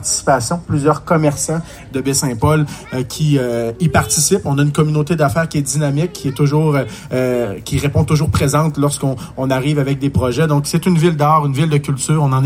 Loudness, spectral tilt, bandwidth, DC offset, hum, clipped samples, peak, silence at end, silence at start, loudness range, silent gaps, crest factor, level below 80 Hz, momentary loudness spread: -16 LUFS; -5.5 dB/octave; 16 kHz; under 0.1%; none; under 0.1%; 0 dBFS; 0 s; 0 s; 2 LU; none; 14 dB; -40 dBFS; 7 LU